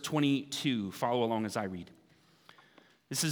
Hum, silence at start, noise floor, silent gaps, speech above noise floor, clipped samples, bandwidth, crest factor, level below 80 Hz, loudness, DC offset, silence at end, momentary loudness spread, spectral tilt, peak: none; 0 s; -65 dBFS; none; 33 dB; under 0.1%; over 20 kHz; 18 dB; -76 dBFS; -33 LUFS; under 0.1%; 0 s; 11 LU; -4.5 dB/octave; -16 dBFS